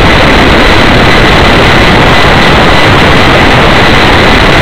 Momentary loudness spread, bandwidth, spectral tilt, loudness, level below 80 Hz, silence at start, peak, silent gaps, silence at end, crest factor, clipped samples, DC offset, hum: 0 LU; over 20 kHz; -5 dB/octave; -3 LUFS; -12 dBFS; 0 s; 0 dBFS; none; 0 s; 4 dB; 20%; 20%; none